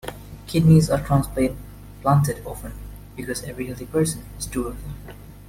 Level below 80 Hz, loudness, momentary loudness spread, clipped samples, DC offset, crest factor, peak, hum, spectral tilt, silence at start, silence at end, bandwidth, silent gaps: -38 dBFS; -22 LUFS; 22 LU; under 0.1%; under 0.1%; 18 dB; -4 dBFS; 50 Hz at -40 dBFS; -6.5 dB/octave; 0.05 s; 0 s; 16.5 kHz; none